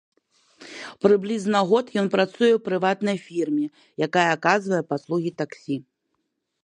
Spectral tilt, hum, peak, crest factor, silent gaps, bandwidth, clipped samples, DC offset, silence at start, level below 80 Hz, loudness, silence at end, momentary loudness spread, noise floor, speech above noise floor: -5.5 dB/octave; none; -4 dBFS; 20 dB; none; 10.5 kHz; under 0.1%; under 0.1%; 0.6 s; -72 dBFS; -23 LUFS; 0.85 s; 12 LU; -76 dBFS; 54 dB